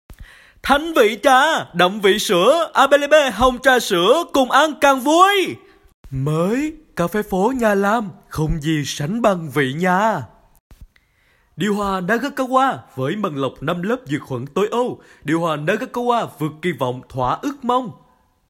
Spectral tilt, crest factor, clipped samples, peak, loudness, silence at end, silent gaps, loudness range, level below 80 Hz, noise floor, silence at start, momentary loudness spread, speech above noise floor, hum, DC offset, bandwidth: -4.5 dB/octave; 18 dB; under 0.1%; 0 dBFS; -18 LUFS; 0.6 s; 5.94-6.04 s, 10.60-10.70 s; 7 LU; -42 dBFS; -59 dBFS; 0.1 s; 11 LU; 41 dB; none; under 0.1%; 16.5 kHz